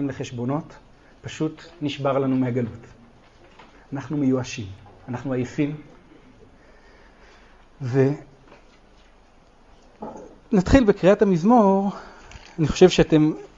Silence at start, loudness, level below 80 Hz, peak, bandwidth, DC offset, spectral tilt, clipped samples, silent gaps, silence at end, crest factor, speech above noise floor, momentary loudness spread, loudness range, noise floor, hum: 0 s; -21 LUFS; -42 dBFS; -2 dBFS; 8 kHz; under 0.1%; -7 dB/octave; under 0.1%; none; 0.1 s; 22 dB; 32 dB; 22 LU; 11 LU; -53 dBFS; none